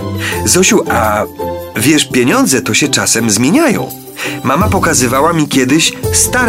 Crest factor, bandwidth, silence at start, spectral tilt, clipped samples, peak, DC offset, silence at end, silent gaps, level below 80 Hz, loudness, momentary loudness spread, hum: 12 dB; 16.5 kHz; 0 s; -3.5 dB/octave; under 0.1%; 0 dBFS; under 0.1%; 0 s; none; -34 dBFS; -11 LUFS; 9 LU; none